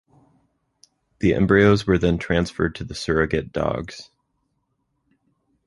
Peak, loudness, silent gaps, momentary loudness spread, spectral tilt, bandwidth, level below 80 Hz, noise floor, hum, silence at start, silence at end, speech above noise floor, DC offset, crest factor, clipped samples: -2 dBFS; -21 LUFS; none; 14 LU; -6.5 dB/octave; 11.5 kHz; -40 dBFS; -72 dBFS; none; 1.2 s; 1.65 s; 52 dB; under 0.1%; 20 dB; under 0.1%